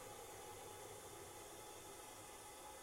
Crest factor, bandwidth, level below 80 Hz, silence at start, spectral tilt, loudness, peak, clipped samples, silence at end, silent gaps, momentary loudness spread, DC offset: 14 dB; 16 kHz; -74 dBFS; 0 s; -2.5 dB/octave; -54 LUFS; -42 dBFS; under 0.1%; 0 s; none; 1 LU; under 0.1%